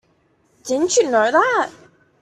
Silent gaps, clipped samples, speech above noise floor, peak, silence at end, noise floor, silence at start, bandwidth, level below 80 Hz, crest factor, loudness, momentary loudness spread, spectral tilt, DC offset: none; under 0.1%; 44 dB; -2 dBFS; 0.5 s; -61 dBFS; 0.65 s; 13.5 kHz; -64 dBFS; 18 dB; -17 LUFS; 11 LU; -2 dB/octave; under 0.1%